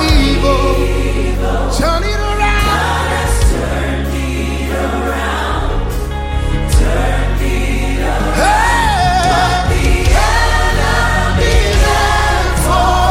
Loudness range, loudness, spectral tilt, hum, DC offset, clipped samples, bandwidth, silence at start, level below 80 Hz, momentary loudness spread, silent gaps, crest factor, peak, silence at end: 4 LU; -14 LUFS; -4.5 dB/octave; none; under 0.1%; under 0.1%; 16 kHz; 0 s; -16 dBFS; 6 LU; none; 12 dB; 0 dBFS; 0 s